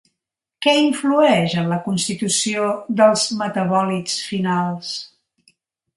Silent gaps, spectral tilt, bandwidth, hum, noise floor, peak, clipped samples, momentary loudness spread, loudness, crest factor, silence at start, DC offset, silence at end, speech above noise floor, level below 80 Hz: none; -4 dB/octave; 11.5 kHz; none; -82 dBFS; -2 dBFS; under 0.1%; 8 LU; -19 LUFS; 18 dB; 0.6 s; under 0.1%; 0.9 s; 64 dB; -64 dBFS